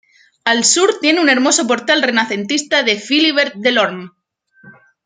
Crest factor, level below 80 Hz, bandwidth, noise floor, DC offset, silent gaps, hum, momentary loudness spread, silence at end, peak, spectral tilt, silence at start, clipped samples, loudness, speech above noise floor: 16 dB; -68 dBFS; 9.8 kHz; -52 dBFS; under 0.1%; none; none; 6 LU; 0.35 s; 0 dBFS; -1.5 dB/octave; 0.45 s; under 0.1%; -14 LUFS; 37 dB